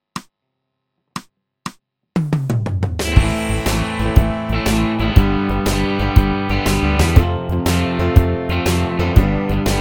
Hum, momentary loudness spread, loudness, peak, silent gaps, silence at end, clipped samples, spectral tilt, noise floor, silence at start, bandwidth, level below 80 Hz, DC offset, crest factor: none; 18 LU; -17 LUFS; 0 dBFS; none; 0 s; 0.1%; -6 dB/octave; -75 dBFS; 0.15 s; 19.5 kHz; -22 dBFS; under 0.1%; 16 dB